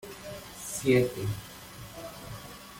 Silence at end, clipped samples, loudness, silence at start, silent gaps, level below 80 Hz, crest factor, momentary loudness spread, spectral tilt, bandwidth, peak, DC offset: 0 s; under 0.1%; -30 LUFS; 0 s; none; -56 dBFS; 20 dB; 19 LU; -5 dB/octave; 17 kHz; -12 dBFS; under 0.1%